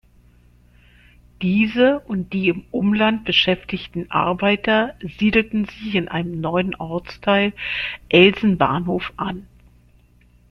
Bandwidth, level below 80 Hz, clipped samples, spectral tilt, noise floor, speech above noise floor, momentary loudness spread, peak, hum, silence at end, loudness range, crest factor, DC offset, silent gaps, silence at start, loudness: 6.4 kHz; -48 dBFS; under 0.1%; -7.5 dB/octave; -53 dBFS; 34 dB; 11 LU; -2 dBFS; 60 Hz at -45 dBFS; 1.05 s; 2 LU; 20 dB; under 0.1%; none; 1.4 s; -19 LUFS